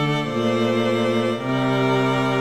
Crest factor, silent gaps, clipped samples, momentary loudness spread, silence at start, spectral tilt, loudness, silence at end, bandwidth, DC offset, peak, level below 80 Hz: 12 dB; none; under 0.1%; 3 LU; 0 s; -6.5 dB/octave; -21 LUFS; 0 s; 14.5 kHz; 0.4%; -8 dBFS; -54 dBFS